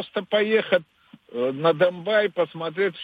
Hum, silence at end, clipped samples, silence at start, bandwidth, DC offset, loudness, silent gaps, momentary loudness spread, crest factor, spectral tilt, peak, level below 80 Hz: none; 0 s; under 0.1%; 0 s; 5 kHz; under 0.1%; -23 LUFS; none; 7 LU; 18 dB; -7 dB/octave; -6 dBFS; -74 dBFS